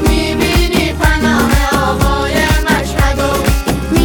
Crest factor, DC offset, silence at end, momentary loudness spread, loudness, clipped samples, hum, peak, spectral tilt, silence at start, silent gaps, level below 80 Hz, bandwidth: 12 dB; under 0.1%; 0 s; 3 LU; -13 LUFS; under 0.1%; none; 0 dBFS; -5 dB/octave; 0 s; none; -18 dBFS; 19.5 kHz